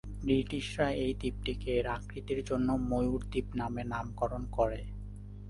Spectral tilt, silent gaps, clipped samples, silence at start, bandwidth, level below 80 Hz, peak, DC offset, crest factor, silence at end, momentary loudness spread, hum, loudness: -6.5 dB/octave; none; under 0.1%; 0.05 s; 11.5 kHz; -44 dBFS; -16 dBFS; under 0.1%; 18 dB; 0 s; 7 LU; 50 Hz at -40 dBFS; -34 LUFS